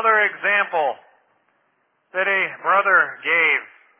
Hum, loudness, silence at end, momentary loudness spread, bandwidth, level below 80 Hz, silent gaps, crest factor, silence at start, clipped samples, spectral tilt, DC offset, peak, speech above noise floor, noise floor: none; -18 LUFS; 0.35 s; 8 LU; 3.7 kHz; under -90 dBFS; none; 16 dB; 0 s; under 0.1%; -5 dB/octave; under 0.1%; -4 dBFS; 47 dB; -67 dBFS